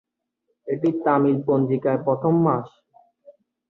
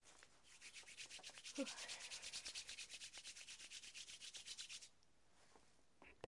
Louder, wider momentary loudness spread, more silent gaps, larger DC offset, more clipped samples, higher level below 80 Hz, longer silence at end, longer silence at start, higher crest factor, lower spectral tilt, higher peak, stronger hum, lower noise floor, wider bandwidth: first, -21 LUFS vs -53 LUFS; second, 10 LU vs 15 LU; neither; neither; neither; first, -66 dBFS vs -82 dBFS; first, 1 s vs 0.1 s; first, 0.65 s vs 0 s; second, 16 dB vs 24 dB; first, -11 dB/octave vs -0.5 dB/octave; first, -6 dBFS vs -32 dBFS; neither; about the same, -75 dBFS vs -78 dBFS; second, 4.1 kHz vs 12 kHz